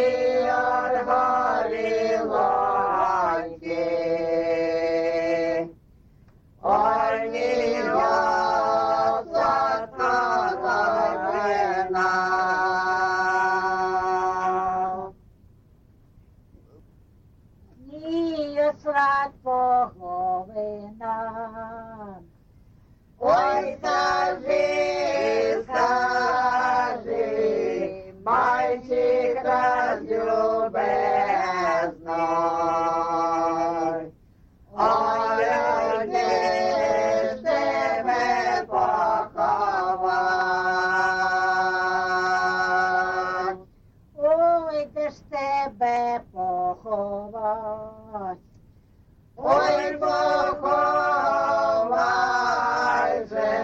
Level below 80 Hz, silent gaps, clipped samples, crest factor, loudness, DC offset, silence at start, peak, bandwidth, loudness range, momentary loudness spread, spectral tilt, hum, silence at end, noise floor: -56 dBFS; none; under 0.1%; 16 dB; -23 LUFS; under 0.1%; 0 s; -8 dBFS; 8 kHz; 6 LU; 8 LU; -4.5 dB/octave; none; 0 s; -55 dBFS